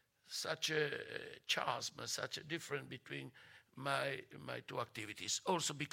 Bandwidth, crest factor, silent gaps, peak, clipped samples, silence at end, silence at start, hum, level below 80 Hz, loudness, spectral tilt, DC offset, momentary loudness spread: 16.5 kHz; 22 dB; none; -20 dBFS; under 0.1%; 0 s; 0.25 s; none; -82 dBFS; -41 LUFS; -2.5 dB/octave; under 0.1%; 11 LU